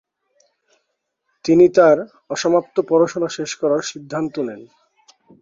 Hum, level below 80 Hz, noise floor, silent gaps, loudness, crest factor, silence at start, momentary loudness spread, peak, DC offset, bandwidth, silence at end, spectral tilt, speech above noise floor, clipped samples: none; -62 dBFS; -74 dBFS; none; -18 LUFS; 18 dB; 1.45 s; 15 LU; -2 dBFS; under 0.1%; 7.8 kHz; 0.8 s; -5 dB/octave; 57 dB; under 0.1%